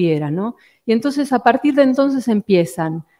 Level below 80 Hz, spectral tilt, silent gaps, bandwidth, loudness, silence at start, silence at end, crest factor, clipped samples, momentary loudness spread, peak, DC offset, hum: -62 dBFS; -7 dB/octave; none; 15.5 kHz; -17 LUFS; 0 s; 0.2 s; 16 dB; under 0.1%; 10 LU; 0 dBFS; under 0.1%; none